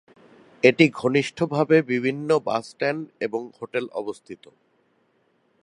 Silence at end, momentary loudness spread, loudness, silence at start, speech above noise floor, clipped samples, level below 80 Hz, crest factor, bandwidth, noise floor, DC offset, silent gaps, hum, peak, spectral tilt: 1.3 s; 14 LU; -23 LUFS; 0.65 s; 43 dB; under 0.1%; -70 dBFS; 24 dB; 11 kHz; -66 dBFS; under 0.1%; none; none; -2 dBFS; -6 dB/octave